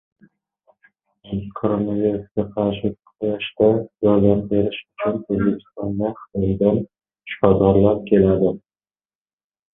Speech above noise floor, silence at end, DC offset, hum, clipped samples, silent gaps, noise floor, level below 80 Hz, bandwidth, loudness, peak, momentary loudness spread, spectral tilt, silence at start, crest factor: over 71 dB; 1.15 s; under 0.1%; none; under 0.1%; none; under -90 dBFS; -44 dBFS; 3.8 kHz; -20 LUFS; 0 dBFS; 12 LU; -12.5 dB/octave; 1.25 s; 20 dB